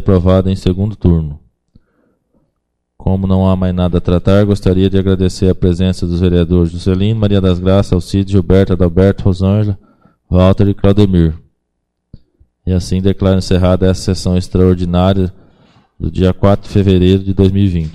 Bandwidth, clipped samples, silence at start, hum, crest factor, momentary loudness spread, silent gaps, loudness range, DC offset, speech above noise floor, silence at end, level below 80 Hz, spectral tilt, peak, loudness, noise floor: 10.5 kHz; under 0.1%; 0 s; none; 12 dB; 6 LU; none; 4 LU; under 0.1%; 58 dB; 0.05 s; -28 dBFS; -8 dB/octave; 0 dBFS; -12 LUFS; -69 dBFS